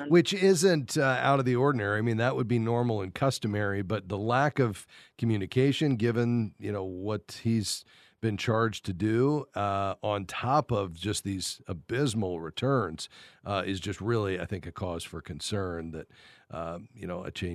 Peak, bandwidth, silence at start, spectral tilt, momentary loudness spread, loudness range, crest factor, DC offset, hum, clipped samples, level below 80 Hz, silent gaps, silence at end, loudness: -10 dBFS; 13.5 kHz; 0 s; -5.5 dB/octave; 13 LU; 6 LU; 20 dB; under 0.1%; none; under 0.1%; -62 dBFS; none; 0 s; -29 LUFS